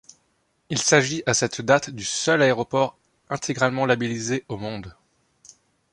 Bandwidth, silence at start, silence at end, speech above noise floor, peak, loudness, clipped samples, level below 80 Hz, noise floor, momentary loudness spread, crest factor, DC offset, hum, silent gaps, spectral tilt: 11.5 kHz; 0.7 s; 1 s; 46 dB; -2 dBFS; -22 LUFS; under 0.1%; -58 dBFS; -68 dBFS; 13 LU; 22 dB; under 0.1%; none; none; -3.5 dB/octave